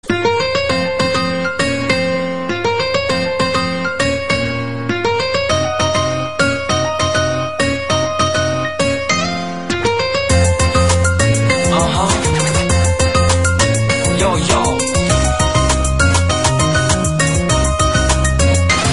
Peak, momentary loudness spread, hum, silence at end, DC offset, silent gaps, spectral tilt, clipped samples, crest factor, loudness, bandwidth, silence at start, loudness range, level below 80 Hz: 0 dBFS; 4 LU; none; 0 s; 2%; none; -4 dB/octave; under 0.1%; 14 dB; -15 LUFS; 11.5 kHz; 0.05 s; 3 LU; -26 dBFS